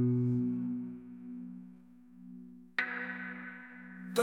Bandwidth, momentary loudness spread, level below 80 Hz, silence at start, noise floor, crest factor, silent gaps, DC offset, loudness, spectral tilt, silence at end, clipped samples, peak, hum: 11.5 kHz; 21 LU; -74 dBFS; 0 s; -56 dBFS; 20 dB; none; under 0.1%; -37 LUFS; -6.5 dB/octave; 0 s; under 0.1%; -16 dBFS; none